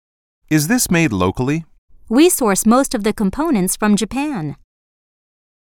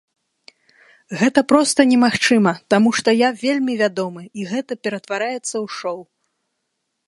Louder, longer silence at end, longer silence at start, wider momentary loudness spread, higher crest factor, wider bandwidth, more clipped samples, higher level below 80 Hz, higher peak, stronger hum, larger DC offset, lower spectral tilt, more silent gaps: about the same, -16 LUFS vs -18 LUFS; about the same, 1.15 s vs 1.05 s; second, 0.5 s vs 1.1 s; second, 9 LU vs 13 LU; about the same, 16 dB vs 20 dB; first, 18 kHz vs 11.5 kHz; neither; first, -42 dBFS vs -64 dBFS; about the same, -2 dBFS vs 0 dBFS; neither; neither; about the same, -4.5 dB/octave vs -4 dB/octave; first, 1.78-1.88 s vs none